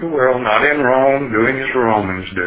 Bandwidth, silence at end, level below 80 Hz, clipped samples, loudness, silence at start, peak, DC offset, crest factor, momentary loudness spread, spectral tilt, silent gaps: 4 kHz; 0 s; -44 dBFS; under 0.1%; -15 LUFS; 0 s; 0 dBFS; under 0.1%; 14 dB; 3 LU; -9.5 dB/octave; none